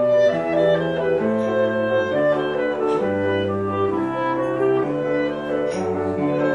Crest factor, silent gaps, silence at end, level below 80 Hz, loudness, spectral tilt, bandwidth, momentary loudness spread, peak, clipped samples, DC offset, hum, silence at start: 12 dB; none; 0 s; -56 dBFS; -21 LUFS; -7 dB/octave; 10.5 kHz; 4 LU; -8 dBFS; under 0.1%; 0.1%; none; 0 s